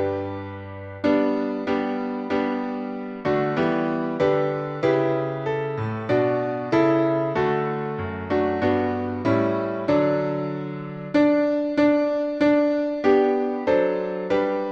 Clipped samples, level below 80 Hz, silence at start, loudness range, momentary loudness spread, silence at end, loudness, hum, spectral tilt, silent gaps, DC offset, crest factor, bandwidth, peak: under 0.1%; -58 dBFS; 0 s; 3 LU; 9 LU; 0 s; -23 LUFS; none; -8 dB/octave; none; under 0.1%; 16 dB; 7 kHz; -6 dBFS